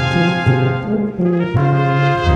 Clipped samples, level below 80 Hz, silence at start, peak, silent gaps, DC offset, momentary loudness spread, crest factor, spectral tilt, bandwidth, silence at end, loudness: under 0.1%; -34 dBFS; 0 s; -2 dBFS; none; under 0.1%; 3 LU; 12 dB; -7.5 dB/octave; 8 kHz; 0 s; -16 LUFS